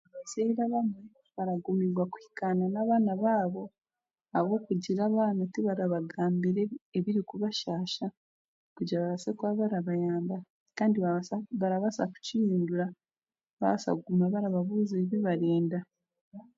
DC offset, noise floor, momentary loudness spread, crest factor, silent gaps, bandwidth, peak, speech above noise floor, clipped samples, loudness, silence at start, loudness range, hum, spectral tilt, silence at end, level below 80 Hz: under 0.1%; under -90 dBFS; 8 LU; 16 dB; 6.81-6.92 s, 8.17-8.76 s, 10.50-10.66 s, 13.49-13.57 s, 16.21-16.32 s; 7.8 kHz; -14 dBFS; over 61 dB; under 0.1%; -31 LUFS; 0.15 s; 3 LU; none; -7 dB/octave; 0.15 s; -76 dBFS